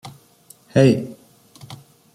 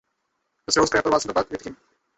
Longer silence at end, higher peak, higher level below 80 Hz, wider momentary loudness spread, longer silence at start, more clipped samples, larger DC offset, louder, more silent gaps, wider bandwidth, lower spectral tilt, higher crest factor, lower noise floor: about the same, 0.4 s vs 0.45 s; first, -2 dBFS vs -6 dBFS; about the same, -56 dBFS vs -52 dBFS; first, 26 LU vs 19 LU; second, 0.05 s vs 0.7 s; neither; neither; first, -18 LUFS vs -22 LUFS; neither; first, 15 kHz vs 8.2 kHz; first, -7 dB/octave vs -3 dB/octave; about the same, 20 dB vs 20 dB; second, -51 dBFS vs -75 dBFS